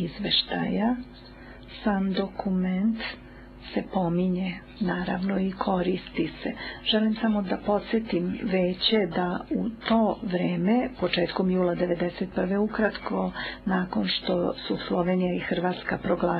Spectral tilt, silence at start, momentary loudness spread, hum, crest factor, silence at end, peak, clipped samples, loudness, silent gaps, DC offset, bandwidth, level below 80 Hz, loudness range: -9 dB/octave; 0 s; 8 LU; none; 16 dB; 0 s; -10 dBFS; under 0.1%; -27 LUFS; none; under 0.1%; 5.2 kHz; -50 dBFS; 3 LU